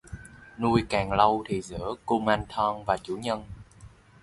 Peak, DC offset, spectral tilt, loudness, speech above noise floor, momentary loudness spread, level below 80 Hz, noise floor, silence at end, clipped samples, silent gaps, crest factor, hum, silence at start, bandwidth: -4 dBFS; under 0.1%; -6 dB/octave; -27 LUFS; 25 dB; 22 LU; -48 dBFS; -51 dBFS; 0.35 s; under 0.1%; none; 24 dB; none; 0.05 s; 11.5 kHz